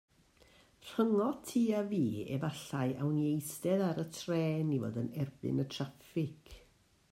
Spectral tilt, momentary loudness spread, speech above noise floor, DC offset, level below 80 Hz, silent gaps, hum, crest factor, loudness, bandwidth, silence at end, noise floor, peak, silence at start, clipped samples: -6.5 dB/octave; 7 LU; 33 dB; under 0.1%; -68 dBFS; none; none; 16 dB; -35 LUFS; 16 kHz; 0.55 s; -67 dBFS; -18 dBFS; 0.8 s; under 0.1%